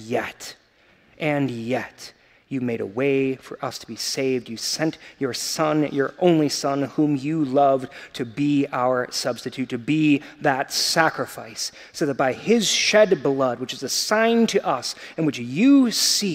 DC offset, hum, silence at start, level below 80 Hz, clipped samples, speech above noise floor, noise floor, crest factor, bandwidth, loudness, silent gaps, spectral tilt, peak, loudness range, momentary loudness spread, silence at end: under 0.1%; none; 0 s; -66 dBFS; under 0.1%; 35 dB; -57 dBFS; 22 dB; 16 kHz; -22 LUFS; none; -4 dB/octave; 0 dBFS; 6 LU; 13 LU; 0 s